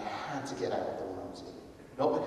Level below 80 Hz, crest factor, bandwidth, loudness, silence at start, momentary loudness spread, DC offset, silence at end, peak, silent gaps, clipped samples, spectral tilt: -64 dBFS; 20 dB; 13 kHz; -36 LUFS; 0 s; 15 LU; under 0.1%; 0 s; -16 dBFS; none; under 0.1%; -5.5 dB/octave